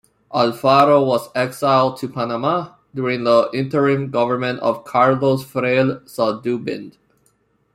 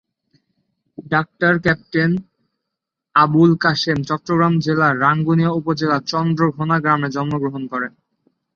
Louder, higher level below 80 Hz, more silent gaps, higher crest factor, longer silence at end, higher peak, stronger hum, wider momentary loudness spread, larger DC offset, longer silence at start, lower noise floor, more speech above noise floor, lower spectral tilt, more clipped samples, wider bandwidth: about the same, -18 LUFS vs -17 LUFS; second, -60 dBFS vs -54 dBFS; neither; about the same, 18 dB vs 16 dB; first, 0.85 s vs 0.65 s; about the same, -2 dBFS vs -2 dBFS; neither; about the same, 10 LU vs 8 LU; neither; second, 0.3 s vs 1 s; second, -62 dBFS vs -81 dBFS; second, 45 dB vs 64 dB; about the same, -6.5 dB/octave vs -7 dB/octave; neither; first, 15.5 kHz vs 7 kHz